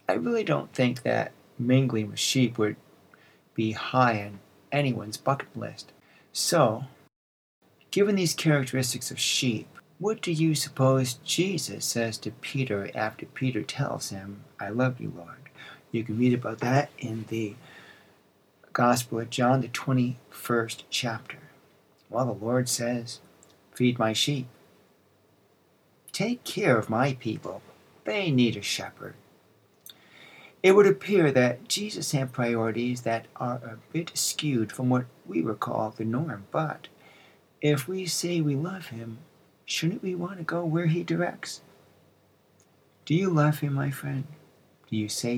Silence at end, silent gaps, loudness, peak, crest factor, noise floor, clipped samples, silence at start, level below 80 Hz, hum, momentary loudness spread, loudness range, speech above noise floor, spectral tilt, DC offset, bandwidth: 0 s; 7.16-7.62 s; -27 LUFS; -6 dBFS; 22 dB; -64 dBFS; under 0.1%; 0.1 s; -76 dBFS; none; 15 LU; 6 LU; 37 dB; -5 dB/octave; under 0.1%; 17.5 kHz